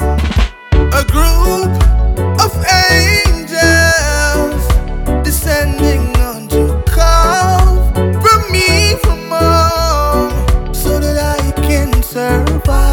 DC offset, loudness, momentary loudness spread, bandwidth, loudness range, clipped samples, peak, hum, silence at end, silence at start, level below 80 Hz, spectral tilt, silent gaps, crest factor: under 0.1%; -12 LUFS; 6 LU; 19 kHz; 3 LU; under 0.1%; 0 dBFS; none; 0 s; 0 s; -14 dBFS; -4.5 dB/octave; none; 10 dB